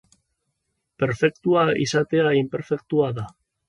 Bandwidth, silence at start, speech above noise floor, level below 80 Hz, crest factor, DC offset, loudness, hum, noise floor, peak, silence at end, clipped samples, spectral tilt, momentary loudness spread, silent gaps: 11 kHz; 1 s; 55 dB; -58 dBFS; 16 dB; under 0.1%; -22 LUFS; none; -76 dBFS; -6 dBFS; 0.4 s; under 0.1%; -6 dB/octave; 8 LU; none